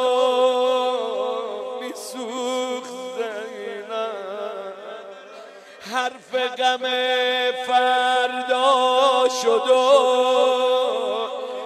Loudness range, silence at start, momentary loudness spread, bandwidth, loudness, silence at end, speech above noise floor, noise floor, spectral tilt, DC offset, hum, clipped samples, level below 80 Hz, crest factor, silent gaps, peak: 12 LU; 0 s; 15 LU; 13 kHz; -21 LUFS; 0 s; 23 dB; -41 dBFS; -1 dB/octave; under 0.1%; none; under 0.1%; -84 dBFS; 18 dB; none; -4 dBFS